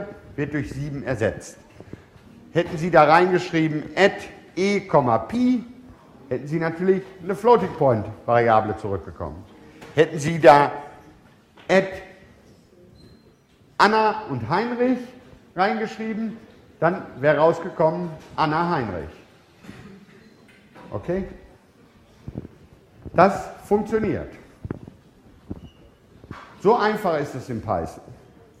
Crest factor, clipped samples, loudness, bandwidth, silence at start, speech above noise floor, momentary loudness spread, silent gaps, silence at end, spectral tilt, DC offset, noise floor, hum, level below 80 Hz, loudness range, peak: 24 dB; under 0.1%; -21 LUFS; 15 kHz; 0 s; 34 dB; 21 LU; none; 0.45 s; -6.5 dB/octave; under 0.1%; -55 dBFS; none; -52 dBFS; 9 LU; 0 dBFS